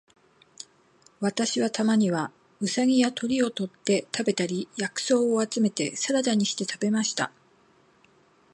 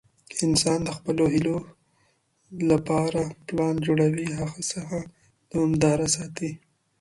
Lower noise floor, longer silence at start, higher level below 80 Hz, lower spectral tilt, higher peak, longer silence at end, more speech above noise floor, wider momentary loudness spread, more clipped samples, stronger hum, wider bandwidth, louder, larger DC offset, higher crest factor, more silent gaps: second, -61 dBFS vs -67 dBFS; first, 1.2 s vs 0.3 s; second, -72 dBFS vs -52 dBFS; about the same, -4 dB/octave vs -5 dB/octave; about the same, -8 dBFS vs -6 dBFS; first, 1.25 s vs 0.45 s; second, 36 dB vs 43 dB; second, 9 LU vs 12 LU; neither; neither; about the same, 11.5 kHz vs 11.5 kHz; about the same, -26 LUFS vs -25 LUFS; neither; about the same, 18 dB vs 18 dB; neither